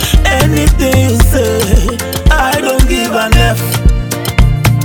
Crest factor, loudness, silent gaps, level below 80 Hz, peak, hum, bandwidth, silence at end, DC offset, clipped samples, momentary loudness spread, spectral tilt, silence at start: 10 dB; -11 LUFS; none; -12 dBFS; 0 dBFS; none; over 20 kHz; 0 s; 0.4%; 0.2%; 4 LU; -5 dB/octave; 0 s